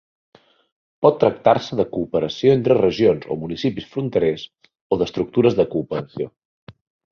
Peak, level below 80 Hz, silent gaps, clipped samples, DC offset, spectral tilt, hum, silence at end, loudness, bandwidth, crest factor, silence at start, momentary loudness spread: -2 dBFS; -52 dBFS; 4.81-4.90 s, 6.45-6.67 s; under 0.1%; under 0.1%; -7.5 dB/octave; none; 0.4 s; -20 LUFS; 6.8 kHz; 18 dB; 1 s; 11 LU